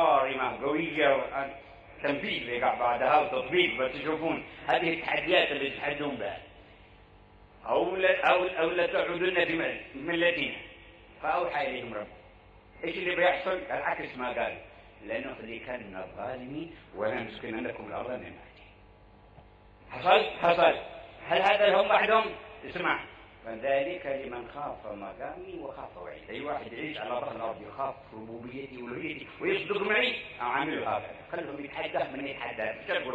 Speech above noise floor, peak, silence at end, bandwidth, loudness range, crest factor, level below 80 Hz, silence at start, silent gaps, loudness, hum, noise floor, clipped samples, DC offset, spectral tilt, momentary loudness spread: 26 dB; -8 dBFS; 0 s; 8 kHz; 11 LU; 22 dB; -60 dBFS; 0 s; none; -29 LUFS; 50 Hz at -65 dBFS; -55 dBFS; under 0.1%; under 0.1%; -6 dB/octave; 16 LU